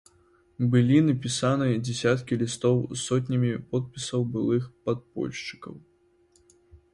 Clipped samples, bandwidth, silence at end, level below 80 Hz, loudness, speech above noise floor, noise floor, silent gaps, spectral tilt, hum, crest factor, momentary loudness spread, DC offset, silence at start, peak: under 0.1%; 11.5 kHz; 0.15 s; -60 dBFS; -26 LUFS; 38 dB; -63 dBFS; none; -6 dB/octave; none; 18 dB; 11 LU; under 0.1%; 0.6 s; -8 dBFS